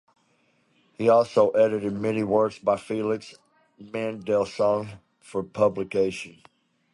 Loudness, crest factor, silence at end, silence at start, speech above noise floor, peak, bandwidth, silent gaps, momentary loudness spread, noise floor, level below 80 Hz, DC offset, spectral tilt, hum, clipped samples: -24 LUFS; 18 dB; 0.65 s; 1 s; 42 dB; -8 dBFS; 11.5 kHz; none; 13 LU; -66 dBFS; -62 dBFS; under 0.1%; -6.5 dB/octave; none; under 0.1%